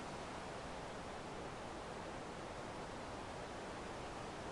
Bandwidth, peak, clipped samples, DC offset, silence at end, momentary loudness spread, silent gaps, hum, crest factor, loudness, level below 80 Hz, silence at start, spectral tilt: 11.5 kHz; -36 dBFS; under 0.1%; under 0.1%; 0 s; 1 LU; none; none; 12 dB; -48 LUFS; -62 dBFS; 0 s; -4.5 dB/octave